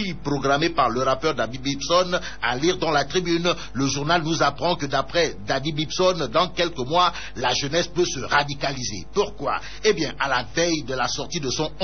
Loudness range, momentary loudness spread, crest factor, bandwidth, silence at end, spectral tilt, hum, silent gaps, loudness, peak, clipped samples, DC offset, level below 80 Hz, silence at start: 2 LU; 6 LU; 16 dB; 6.6 kHz; 0 s; -3 dB/octave; none; none; -23 LUFS; -8 dBFS; under 0.1%; 2%; -44 dBFS; 0 s